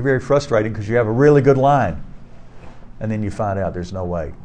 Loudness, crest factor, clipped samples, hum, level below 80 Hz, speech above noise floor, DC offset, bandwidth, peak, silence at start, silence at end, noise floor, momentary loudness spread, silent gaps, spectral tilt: -18 LUFS; 16 dB; under 0.1%; none; -38 dBFS; 21 dB; 1%; 9.2 kHz; -2 dBFS; 0 s; 0 s; -38 dBFS; 13 LU; none; -7.5 dB/octave